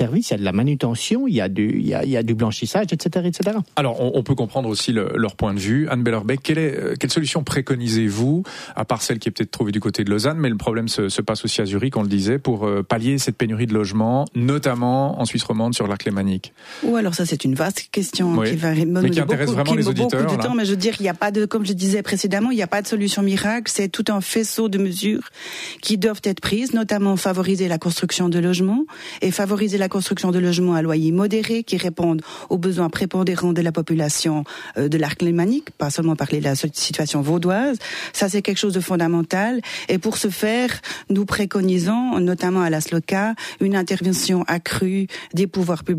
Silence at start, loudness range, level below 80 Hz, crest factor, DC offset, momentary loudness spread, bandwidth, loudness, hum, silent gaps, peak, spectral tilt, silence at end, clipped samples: 0 s; 2 LU; -52 dBFS; 14 dB; under 0.1%; 4 LU; 15.5 kHz; -20 LUFS; none; none; -6 dBFS; -5 dB/octave; 0 s; under 0.1%